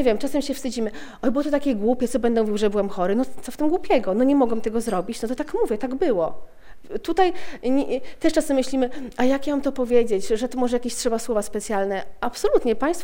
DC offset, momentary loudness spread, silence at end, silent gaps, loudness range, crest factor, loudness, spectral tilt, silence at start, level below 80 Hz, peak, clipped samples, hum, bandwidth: under 0.1%; 7 LU; 0 s; none; 2 LU; 16 dB; -23 LUFS; -5 dB/octave; 0 s; -42 dBFS; -6 dBFS; under 0.1%; none; 16.5 kHz